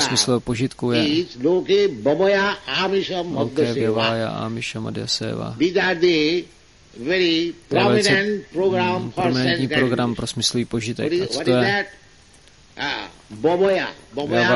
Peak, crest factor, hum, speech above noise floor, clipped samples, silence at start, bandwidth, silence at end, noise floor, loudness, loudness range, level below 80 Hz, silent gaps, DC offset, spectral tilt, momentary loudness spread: -4 dBFS; 16 dB; none; 30 dB; under 0.1%; 0 s; 11.5 kHz; 0 s; -50 dBFS; -20 LUFS; 3 LU; -52 dBFS; none; 0.1%; -4.5 dB/octave; 9 LU